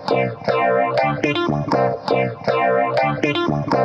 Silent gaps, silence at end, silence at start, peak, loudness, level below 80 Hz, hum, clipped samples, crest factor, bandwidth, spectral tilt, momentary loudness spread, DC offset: none; 0 s; 0 s; -6 dBFS; -19 LUFS; -50 dBFS; none; under 0.1%; 12 dB; 8.6 kHz; -7 dB/octave; 3 LU; under 0.1%